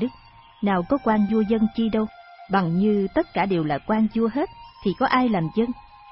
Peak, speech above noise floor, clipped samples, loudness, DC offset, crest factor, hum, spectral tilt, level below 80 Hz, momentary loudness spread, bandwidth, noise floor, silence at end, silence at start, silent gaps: -6 dBFS; 27 dB; under 0.1%; -23 LUFS; under 0.1%; 18 dB; none; -11.5 dB/octave; -50 dBFS; 8 LU; 5.8 kHz; -49 dBFS; 0 s; 0 s; none